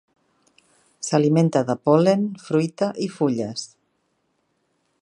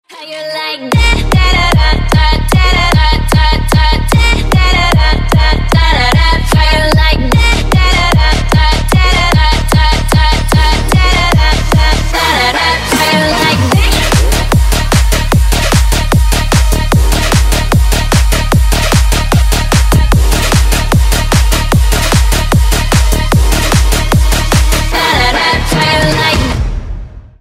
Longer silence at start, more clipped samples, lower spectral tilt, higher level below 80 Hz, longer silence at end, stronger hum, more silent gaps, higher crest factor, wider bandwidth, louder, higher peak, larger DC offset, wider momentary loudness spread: first, 1 s vs 0.1 s; neither; first, -6.5 dB/octave vs -4.5 dB/octave; second, -68 dBFS vs -12 dBFS; first, 1.35 s vs 0.2 s; neither; neither; first, 20 dB vs 8 dB; second, 11 kHz vs 16.5 kHz; second, -21 LUFS vs -10 LUFS; about the same, -2 dBFS vs 0 dBFS; neither; first, 13 LU vs 2 LU